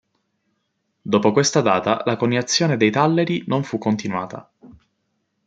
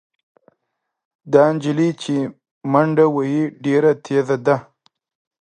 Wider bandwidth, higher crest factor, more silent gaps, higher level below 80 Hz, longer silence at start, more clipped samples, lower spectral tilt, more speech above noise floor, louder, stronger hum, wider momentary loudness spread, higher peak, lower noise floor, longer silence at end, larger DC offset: about the same, 9.4 kHz vs 9.8 kHz; about the same, 20 dB vs 18 dB; second, none vs 2.51-2.61 s; about the same, -64 dBFS vs -68 dBFS; second, 1.05 s vs 1.25 s; neither; second, -4.5 dB/octave vs -7.5 dB/octave; second, 53 dB vs 60 dB; about the same, -19 LUFS vs -18 LUFS; neither; about the same, 10 LU vs 8 LU; about the same, -2 dBFS vs 0 dBFS; second, -72 dBFS vs -77 dBFS; about the same, 0.75 s vs 0.8 s; neither